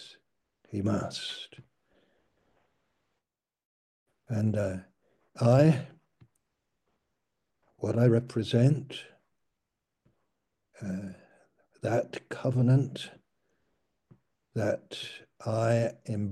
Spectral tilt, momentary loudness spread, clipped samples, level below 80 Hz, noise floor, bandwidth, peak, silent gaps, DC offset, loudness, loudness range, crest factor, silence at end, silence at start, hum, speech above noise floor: -7.5 dB/octave; 17 LU; under 0.1%; -68 dBFS; -88 dBFS; 11.5 kHz; -10 dBFS; 3.65-4.06 s; under 0.1%; -29 LUFS; 9 LU; 20 dB; 0 s; 0 s; none; 60 dB